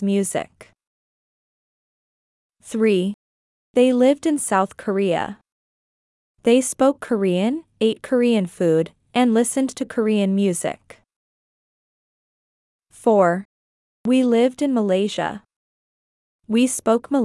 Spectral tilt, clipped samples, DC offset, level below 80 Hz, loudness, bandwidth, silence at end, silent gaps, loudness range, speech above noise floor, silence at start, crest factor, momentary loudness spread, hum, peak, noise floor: -5 dB/octave; under 0.1%; under 0.1%; -66 dBFS; -20 LUFS; 12 kHz; 0 s; 0.87-2.50 s, 3.14-3.74 s, 5.52-6.35 s, 11.16-12.79 s, 13.45-14.04 s, 15.56-16.39 s; 5 LU; over 71 dB; 0 s; 18 dB; 11 LU; none; -4 dBFS; under -90 dBFS